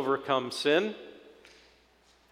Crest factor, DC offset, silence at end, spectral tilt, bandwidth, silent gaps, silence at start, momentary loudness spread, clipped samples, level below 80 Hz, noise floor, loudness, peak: 20 dB; under 0.1%; 1.1 s; -4 dB/octave; 14.5 kHz; none; 0 s; 19 LU; under 0.1%; -72 dBFS; -64 dBFS; -28 LUFS; -12 dBFS